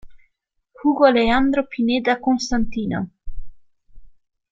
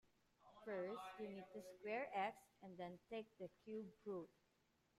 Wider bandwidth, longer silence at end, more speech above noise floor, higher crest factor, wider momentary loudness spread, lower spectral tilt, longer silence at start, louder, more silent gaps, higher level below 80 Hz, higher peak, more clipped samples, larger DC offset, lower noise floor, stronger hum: second, 7.8 kHz vs 14.5 kHz; second, 0.45 s vs 0.7 s; first, 53 dB vs 31 dB; about the same, 20 dB vs 20 dB; about the same, 10 LU vs 12 LU; about the same, -5 dB/octave vs -6 dB/octave; second, 0.05 s vs 0.4 s; first, -19 LUFS vs -52 LUFS; neither; first, -38 dBFS vs -88 dBFS; first, -2 dBFS vs -34 dBFS; neither; neither; second, -71 dBFS vs -82 dBFS; neither